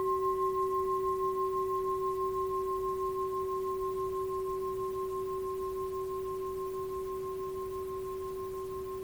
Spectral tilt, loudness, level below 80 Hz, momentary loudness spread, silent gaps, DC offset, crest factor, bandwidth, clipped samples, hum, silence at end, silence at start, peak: -6.5 dB/octave; -34 LUFS; -56 dBFS; 7 LU; none; under 0.1%; 12 dB; over 20 kHz; under 0.1%; none; 0 s; 0 s; -22 dBFS